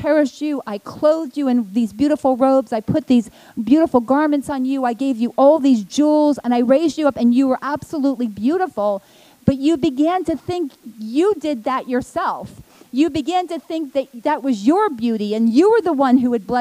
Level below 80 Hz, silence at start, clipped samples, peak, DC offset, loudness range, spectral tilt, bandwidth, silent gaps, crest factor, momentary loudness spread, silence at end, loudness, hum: -52 dBFS; 0 s; under 0.1%; 0 dBFS; under 0.1%; 5 LU; -6.5 dB/octave; 15 kHz; none; 18 dB; 9 LU; 0 s; -18 LUFS; none